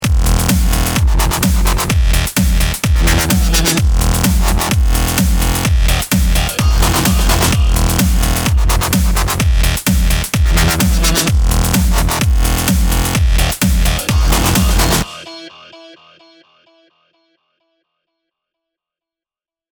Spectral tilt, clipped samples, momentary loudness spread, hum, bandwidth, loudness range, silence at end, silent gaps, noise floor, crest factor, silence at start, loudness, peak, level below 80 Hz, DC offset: -4 dB/octave; under 0.1%; 2 LU; none; over 20 kHz; 3 LU; 3.85 s; none; under -90 dBFS; 12 dB; 0 s; -14 LUFS; 0 dBFS; -16 dBFS; under 0.1%